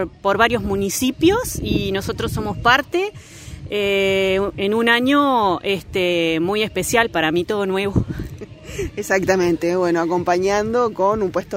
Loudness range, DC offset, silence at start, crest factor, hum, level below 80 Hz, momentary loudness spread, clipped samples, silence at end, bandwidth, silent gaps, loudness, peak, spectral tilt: 2 LU; under 0.1%; 0 s; 18 dB; none; -40 dBFS; 11 LU; under 0.1%; 0 s; 16 kHz; none; -19 LUFS; -2 dBFS; -4.5 dB/octave